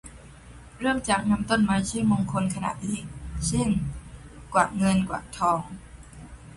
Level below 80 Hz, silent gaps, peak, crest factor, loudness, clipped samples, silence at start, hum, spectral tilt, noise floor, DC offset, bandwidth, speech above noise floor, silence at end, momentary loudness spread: -44 dBFS; none; -8 dBFS; 20 dB; -26 LUFS; under 0.1%; 0.05 s; none; -5 dB/octave; -46 dBFS; under 0.1%; 11.5 kHz; 22 dB; 0 s; 22 LU